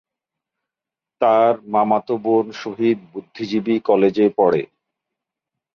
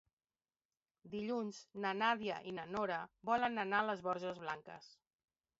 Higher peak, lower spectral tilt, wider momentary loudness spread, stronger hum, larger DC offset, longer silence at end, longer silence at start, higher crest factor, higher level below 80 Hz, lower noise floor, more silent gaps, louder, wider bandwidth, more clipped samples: first, -4 dBFS vs -20 dBFS; first, -7.5 dB/octave vs -2.5 dB/octave; about the same, 11 LU vs 11 LU; neither; neither; first, 1.1 s vs 0.7 s; first, 1.2 s vs 1.05 s; about the same, 16 dB vs 20 dB; first, -64 dBFS vs -78 dBFS; about the same, -87 dBFS vs under -90 dBFS; neither; first, -18 LUFS vs -40 LUFS; second, 6.8 kHz vs 7.6 kHz; neither